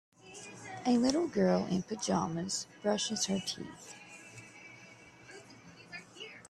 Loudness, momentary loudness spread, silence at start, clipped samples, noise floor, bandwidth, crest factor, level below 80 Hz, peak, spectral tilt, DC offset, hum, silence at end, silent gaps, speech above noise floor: -32 LUFS; 22 LU; 0.25 s; under 0.1%; -55 dBFS; 12.5 kHz; 22 dB; -70 dBFS; -14 dBFS; -4.5 dB/octave; under 0.1%; none; 0.1 s; none; 23 dB